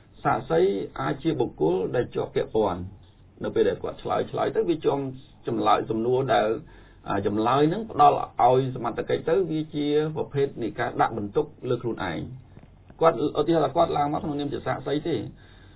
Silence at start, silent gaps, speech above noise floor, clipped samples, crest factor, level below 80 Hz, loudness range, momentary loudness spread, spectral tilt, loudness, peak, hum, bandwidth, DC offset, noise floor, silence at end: 0.2 s; none; 24 dB; under 0.1%; 20 dB; -52 dBFS; 4 LU; 9 LU; -11 dB/octave; -25 LUFS; -6 dBFS; none; 4 kHz; under 0.1%; -49 dBFS; 0.4 s